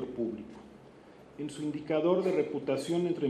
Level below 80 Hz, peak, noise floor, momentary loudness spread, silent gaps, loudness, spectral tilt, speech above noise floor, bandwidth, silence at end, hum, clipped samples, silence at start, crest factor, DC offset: -68 dBFS; -14 dBFS; -54 dBFS; 22 LU; none; -32 LUFS; -6.5 dB/octave; 23 dB; 13 kHz; 0 s; none; under 0.1%; 0 s; 18 dB; under 0.1%